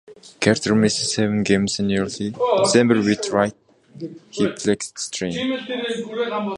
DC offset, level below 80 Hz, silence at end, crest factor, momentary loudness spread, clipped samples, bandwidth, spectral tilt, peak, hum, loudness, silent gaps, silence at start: under 0.1%; -54 dBFS; 0 s; 20 dB; 10 LU; under 0.1%; 11.5 kHz; -4.5 dB/octave; -2 dBFS; none; -20 LUFS; none; 0.1 s